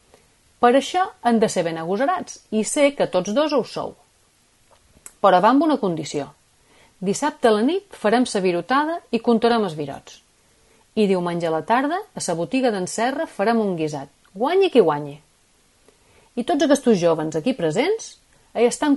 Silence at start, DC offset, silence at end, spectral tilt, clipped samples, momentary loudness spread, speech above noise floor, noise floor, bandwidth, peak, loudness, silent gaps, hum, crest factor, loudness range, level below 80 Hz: 0.6 s; under 0.1%; 0 s; -5 dB/octave; under 0.1%; 12 LU; 40 dB; -59 dBFS; 11.5 kHz; -2 dBFS; -21 LUFS; none; none; 18 dB; 2 LU; -62 dBFS